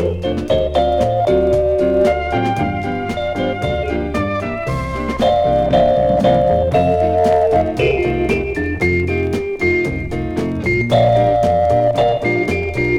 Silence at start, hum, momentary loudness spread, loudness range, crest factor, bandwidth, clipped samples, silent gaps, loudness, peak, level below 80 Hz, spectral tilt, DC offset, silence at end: 0 s; none; 7 LU; 4 LU; 12 dB; 12.5 kHz; under 0.1%; none; -16 LUFS; -2 dBFS; -30 dBFS; -7 dB/octave; under 0.1%; 0 s